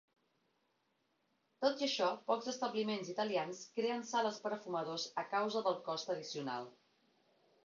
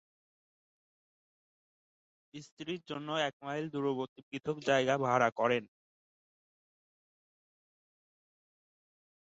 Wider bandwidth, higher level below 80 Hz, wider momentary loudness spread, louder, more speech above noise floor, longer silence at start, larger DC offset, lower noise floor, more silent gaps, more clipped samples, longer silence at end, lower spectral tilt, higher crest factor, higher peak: about the same, 7.4 kHz vs 7.6 kHz; second, -88 dBFS vs -80 dBFS; second, 7 LU vs 14 LU; second, -38 LUFS vs -33 LUFS; second, 42 dB vs over 56 dB; second, 1.6 s vs 2.35 s; neither; second, -80 dBFS vs under -90 dBFS; second, none vs 2.52-2.57 s, 3.33-3.40 s, 4.09-4.16 s, 4.23-4.32 s, 5.32-5.36 s; neither; second, 0.9 s vs 3.7 s; about the same, -2.5 dB/octave vs -3.5 dB/octave; about the same, 20 dB vs 24 dB; second, -20 dBFS vs -14 dBFS